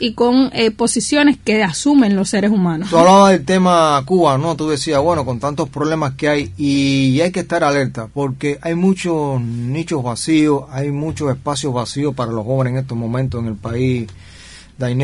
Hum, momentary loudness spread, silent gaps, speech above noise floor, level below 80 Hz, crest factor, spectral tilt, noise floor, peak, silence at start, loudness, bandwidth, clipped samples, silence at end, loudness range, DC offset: none; 9 LU; none; 24 dB; -46 dBFS; 16 dB; -5.5 dB/octave; -39 dBFS; 0 dBFS; 0 s; -16 LUFS; 11.5 kHz; under 0.1%; 0 s; 7 LU; under 0.1%